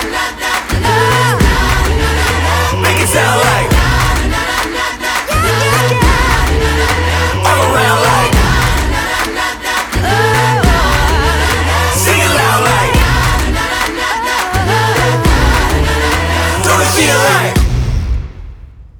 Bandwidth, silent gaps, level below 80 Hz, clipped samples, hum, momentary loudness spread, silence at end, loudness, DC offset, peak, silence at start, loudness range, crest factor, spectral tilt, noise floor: over 20 kHz; none; -18 dBFS; under 0.1%; none; 5 LU; 0.1 s; -11 LUFS; under 0.1%; 0 dBFS; 0 s; 1 LU; 12 dB; -4 dB/octave; -32 dBFS